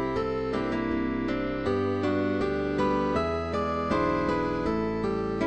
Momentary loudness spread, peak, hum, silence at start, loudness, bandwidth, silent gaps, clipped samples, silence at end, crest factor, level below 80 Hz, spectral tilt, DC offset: 3 LU; -14 dBFS; none; 0 s; -28 LUFS; 8.8 kHz; none; under 0.1%; 0 s; 14 dB; -44 dBFS; -7.5 dB/octave; 0.3%